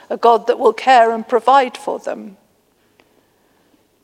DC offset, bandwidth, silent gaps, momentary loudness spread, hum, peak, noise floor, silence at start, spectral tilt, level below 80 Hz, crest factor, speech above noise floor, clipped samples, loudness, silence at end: under 0.1%; 12.5 kHz; none; 14 LU; none; 0 dBFS; -59 dBFS; 0.1 s; -3.5 dB/octave; -74 dBFS; 16 dB; 44 dB; under 0.1%; -14 LUFS; 1.75 s